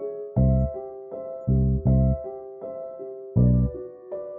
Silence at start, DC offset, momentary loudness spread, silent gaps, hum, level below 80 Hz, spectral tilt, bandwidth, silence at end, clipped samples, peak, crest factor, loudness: 0 s; under 0.1%; 16 LU; none; none; -30 dBFS; -15.5 dB/octave; 2.1 kHz; 0 s; under 0.1%; -8 dBFS; 16 dB; -24 LUFS